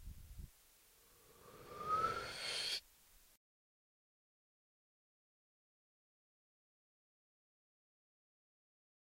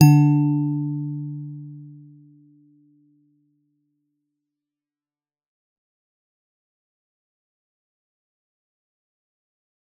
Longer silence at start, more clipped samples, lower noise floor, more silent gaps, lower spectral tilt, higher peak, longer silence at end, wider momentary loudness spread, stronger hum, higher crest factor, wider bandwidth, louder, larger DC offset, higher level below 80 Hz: about the same, 0 s vs 0 s; neither; second, -69 dBFS vs under -90 dBFS; neither; second, -2 dB/octave vs -9 dB/octave; second, -26 dBFS vs -2 dBFS; second, 5.8 s vs 8.05 s; second, 22 LU vs 25 LU; neither; about the same, 24 dB vs 24 dB; first, 16 kHz vs 6.8 kHz; second, -41 LUFS vs -21 LUFS; neither; first, -66 dBFS vs -72 dBFS